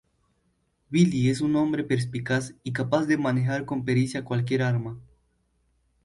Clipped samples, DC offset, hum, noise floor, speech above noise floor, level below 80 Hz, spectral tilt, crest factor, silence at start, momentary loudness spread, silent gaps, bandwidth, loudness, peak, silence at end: under 0.1%; under 0.1%; none; -71 dBFS; 46 dB; -60 dBFS; -7 dB/octave; 18 dB; 0.9 s; 7 LU; none; 11.5 kHz; -25 LUFS; -8 dBFS; 1.05 s